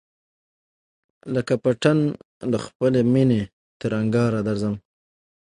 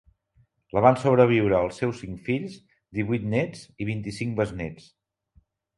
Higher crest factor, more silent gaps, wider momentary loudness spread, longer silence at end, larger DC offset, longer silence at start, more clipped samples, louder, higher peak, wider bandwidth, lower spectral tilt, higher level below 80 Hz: second, 18 dB vs 24 dB; first, 2.25-2.41 s, 2.75-2.80 s, 3.53-3.80 s vs none; second, 13 LU vs 16 LU; second, 0.7 s vs 1 s; neither; first, 1.25 s vs 0.75 s; neither; first, -22 LUFS vs -25 LUFS; about the same, -4 dBFS vs -2 dBFS; about the same, 11 kHz vs 11.5 kHz; about the same, -7.5 dB/octave vs -7.5 dB/octave; about the same, -56 dBFS vs -52 dBFS